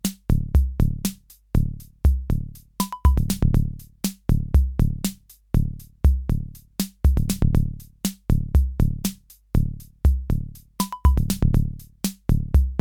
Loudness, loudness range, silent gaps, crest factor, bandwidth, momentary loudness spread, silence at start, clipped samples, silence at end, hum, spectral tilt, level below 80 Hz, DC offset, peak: -24 LUFS; 1 LU; none; 16 dB; 19 kHz; 9 LU; 0.05 s; under 0.1%; 0 s; none; -6.5 dB/octave; -24 dBFS; under 0.1%; -6 dBFS